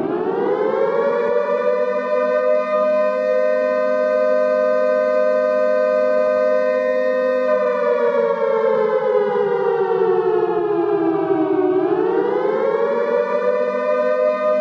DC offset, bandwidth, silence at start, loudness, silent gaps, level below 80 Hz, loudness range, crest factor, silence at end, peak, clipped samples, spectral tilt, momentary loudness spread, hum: under 0.1%; 7 kHz; 0 s; -18 LUFS; none; -68 dBFS; 1 LU; 10 dB; 0 s; -6 dBFS; under 0.1%; -7 dB/octave; 2 LU; none